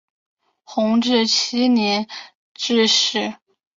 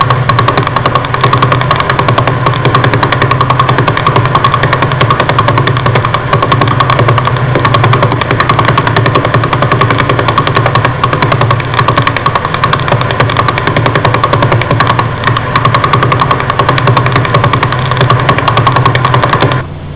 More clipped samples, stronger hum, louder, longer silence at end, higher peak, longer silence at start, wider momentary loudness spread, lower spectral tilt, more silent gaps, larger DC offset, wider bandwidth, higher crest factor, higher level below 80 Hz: neither; neither; second, -18 LUFS vs -9 LUFS; first, 0.45 s vs 0 s; second, -4 dBFS vs 0 dBFS; first, 0.7 s vs 0 s; first, 13 LU vs 2 LU; second, -3 dB/octave vs -10 dB/octave; first, 2.35-2.55 s vs none; second, under 0.1% vs 2%; first, 7.6 kHz vs 4 kHz; first, 16 dB vs 8 dB; second, -66 dBFS vs -28 dBFS